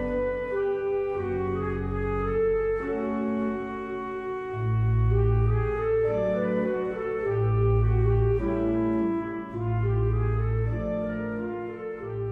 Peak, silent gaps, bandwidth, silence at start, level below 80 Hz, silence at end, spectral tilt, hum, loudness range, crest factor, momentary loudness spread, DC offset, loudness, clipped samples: -12 dBFS; none; 3.7 kHz; 0 s; -36 dBFS; 0 s; -10.5 dB/octave; none; 3 LU; 12 dB; 9 LU; under 0.1%; -27 LUFS; under 0.1%